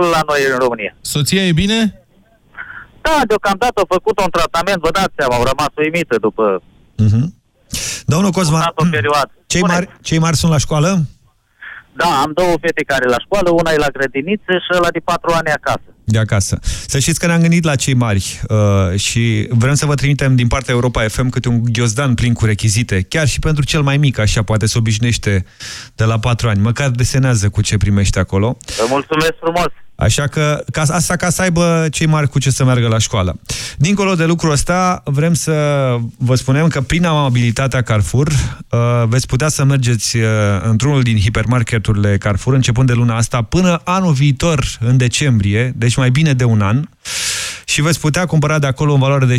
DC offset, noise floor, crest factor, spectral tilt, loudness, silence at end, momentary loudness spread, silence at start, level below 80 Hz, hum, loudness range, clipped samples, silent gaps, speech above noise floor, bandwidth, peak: under 0.1%; -51 dBFS; 10 dB; -5 dB/octave; -14 LUFS; 0 s; 5 LU; 0 s; -32 dBFS; none; 2 LU; under 0.1%; none; 37 dB; 16 kHz; -4 dBFS